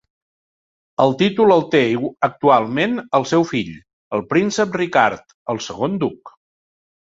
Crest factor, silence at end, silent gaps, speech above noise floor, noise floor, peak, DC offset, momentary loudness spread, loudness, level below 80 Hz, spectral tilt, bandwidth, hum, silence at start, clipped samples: 18 dB; 0.75 s; 3.93-4.11 s, 5.34-5.46 s; over 72 dB; under -90 dBFS; -2 dBFS; under 0.1%; 11 LU; -18 LUFS; -58 dBFS; -5.5 dB/octave; 7.8 kHz; none; 1 s; under 0.1%